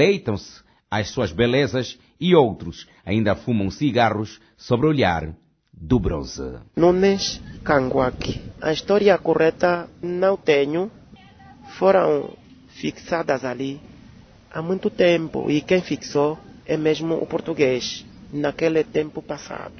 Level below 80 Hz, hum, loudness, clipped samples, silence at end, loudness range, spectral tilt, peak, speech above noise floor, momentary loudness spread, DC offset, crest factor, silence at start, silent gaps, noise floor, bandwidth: -44 dBFS; none; -21 LUFS; under 0.1%; 0 s; 4 LU; -6 dB/octave; -2 dBFS; 26 dB; 14 LU; under 0.1%; 20 dB; 0 s; none; -47 dBFS; 6.6 kHz